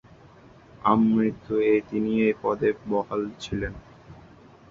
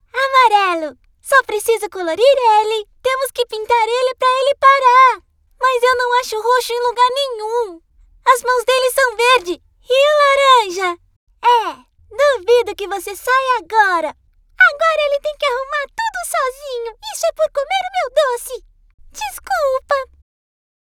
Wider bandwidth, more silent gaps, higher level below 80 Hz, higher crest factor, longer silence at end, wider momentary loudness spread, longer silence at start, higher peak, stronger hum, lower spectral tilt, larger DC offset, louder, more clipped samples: second, 7.2 kHz vs 18 kHz; second, none vs 11.16-11.27 s, 18.94-18.98 s; about the same, -50 dBFS vs -52 dBFS; about the same, 20 dB vs 16 dB; second, 0.55 s vs 0.85 s; second, 10 LU vs 15 LU; first, 0.85 s vs 0.15 s; second, -6 dBFS vs 0 dBFS; neither; first, -7.5 dB/octave vs -0.5 dB/octave; neither; second, -25 LUFS vs -15 LUFS; neither